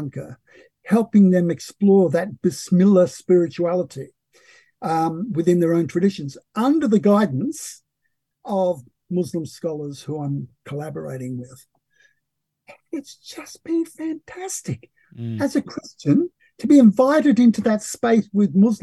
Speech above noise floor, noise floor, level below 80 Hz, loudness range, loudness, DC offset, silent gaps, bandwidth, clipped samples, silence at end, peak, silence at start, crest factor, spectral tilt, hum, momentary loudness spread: 58 dB; -77 dBFS; -64 dBFS; 14 LU; -20 LUFS; under 0.1%; none; 12.5 kHz; under 0.1%; 0.05 s; -4 dBFS; 0 s; 16 dB; -7 dB/octave; none; 18 LU